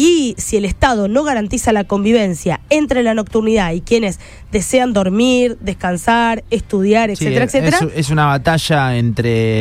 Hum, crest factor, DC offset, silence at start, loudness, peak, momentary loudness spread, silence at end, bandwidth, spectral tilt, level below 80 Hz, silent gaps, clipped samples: none; 14 dB; under 0.1%; 0 s; -15 LUFS; 0 dBFS; 5 LU; 0 s; 16 kHz; -5.5 dB/octave; -34 dBFS; none; under 0.1%